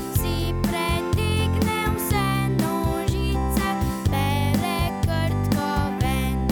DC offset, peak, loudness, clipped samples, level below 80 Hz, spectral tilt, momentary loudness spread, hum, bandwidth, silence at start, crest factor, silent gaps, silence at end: under 0.1%; -6 dBFS; -23 LUFS; under 0.1%; -30 dBFS; -5.5 dB/octave; 2 LU; none; over 20 kHz; 0 s; 16 dB; none; 0 s